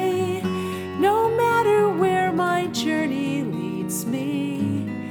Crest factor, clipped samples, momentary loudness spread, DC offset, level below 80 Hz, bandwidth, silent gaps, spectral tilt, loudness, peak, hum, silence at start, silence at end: 14 dB; under 0.1%; 8 LU; under 0.1%; -60 dBFS; 19 kHz; none; -5.5 dB/octave; -22 LUFS; -8 dBFS; none; 0 s; 0 s